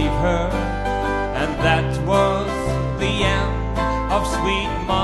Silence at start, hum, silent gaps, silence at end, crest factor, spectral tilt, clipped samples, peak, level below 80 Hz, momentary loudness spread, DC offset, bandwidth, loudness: 0 s; none; none; 0 s; 14 dB; -5.5 dB/octave; under 0.1%; -4 dBFS; -28 dBFS; 5 LU; under 0.1%; 12.5 kHz; -21 LUFS